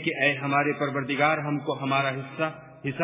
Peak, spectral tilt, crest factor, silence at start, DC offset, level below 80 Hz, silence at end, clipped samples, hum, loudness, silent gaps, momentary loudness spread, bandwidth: -6 dBFS; -9.5 dB/octave; 20 dB; 0 s; under 0.1%; -72 dBFS; 0 s; under 0.1%; none; -26 LUFS; none; 8 LU; 3.9 kHz